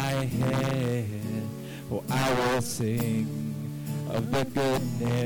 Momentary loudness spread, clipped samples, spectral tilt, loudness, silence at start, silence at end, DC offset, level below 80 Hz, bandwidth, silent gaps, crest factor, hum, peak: 8 LU; under 0.1%; -6 dB/octave; -29 LUFS; 0 s; 0 s; under 0.1%; -52 dBFS; 19 kHz; none; 12 dB; none; -16 dBFS